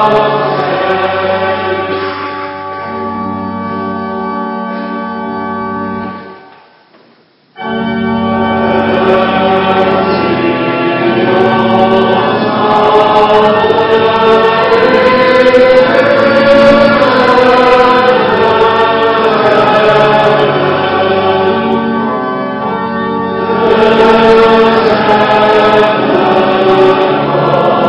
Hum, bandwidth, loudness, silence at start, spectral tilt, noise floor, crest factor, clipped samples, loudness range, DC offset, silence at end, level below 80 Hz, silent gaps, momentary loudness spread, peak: none; 10 kHz; -9 LUFS; 0 s; -6.5 dB/octave; -47 dBFS; 10 dB; 1%; 11 LU; under 0.1%; 0 s; -42 dBFS; none; 12 LU; 0 dBFS